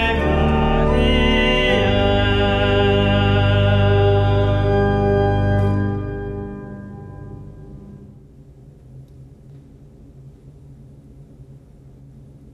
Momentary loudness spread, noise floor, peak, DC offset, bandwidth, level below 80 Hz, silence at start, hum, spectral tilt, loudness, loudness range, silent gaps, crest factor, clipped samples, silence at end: 20 LU; -44 dBFS; -2 dBFS; under 0.1%; 7 kHz; -28 dBFS; 0 s; none; -7.5 dB/octave; -17 LUFS; 18 LU; none; 16 dB; under 0.1%; 0.95 s